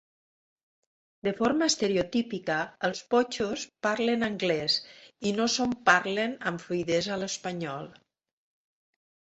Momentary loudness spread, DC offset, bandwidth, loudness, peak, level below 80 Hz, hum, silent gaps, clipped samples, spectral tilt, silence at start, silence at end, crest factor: 10 LU; under 0.1%; 8.2 kHz; -28 LUFS; -6 dBFS; -64 dBFS; none; none; under 0.1%; -3.5 dB/octave; 1.25 s; 1.35 s; 24 dB